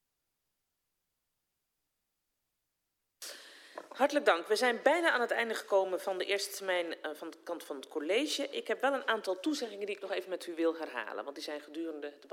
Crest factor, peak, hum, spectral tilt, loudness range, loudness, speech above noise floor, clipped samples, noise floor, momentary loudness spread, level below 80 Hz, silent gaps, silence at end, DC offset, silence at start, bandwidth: 24 dB; -12 dBFS; none; -1.5 dB/octave; 6 LU; -33 LUFS; 51 dB; under 0.1%; -85 dBFS; 16 LU; under -90 dBFS; none; 0.05 s; under 0.1%; 3.2 s; 16.5 kHz